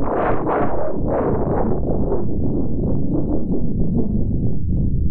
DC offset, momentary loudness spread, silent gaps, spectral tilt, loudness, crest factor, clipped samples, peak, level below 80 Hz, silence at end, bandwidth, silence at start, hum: 9%; 2 LU; none; -14 dB/octave; -21 LUFS; 12 dB; under 0.1%; -6 dBFS; -26 dBFS; 0 s; 3.3 kHz; 0 s; none